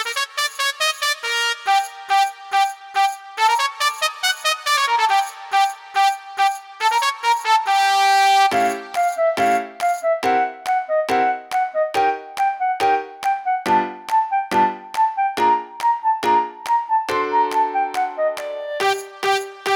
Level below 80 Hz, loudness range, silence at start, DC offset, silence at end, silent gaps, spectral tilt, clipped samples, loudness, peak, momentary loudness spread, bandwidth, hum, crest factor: -66 dBFS; 3 LU; 0 s; under 0.1%; 0 s; none; -1 dB/octave; under 0.1%; -19 LUFS; -2 dBFS; 5 LU; over 20 kHz; none; 16 dB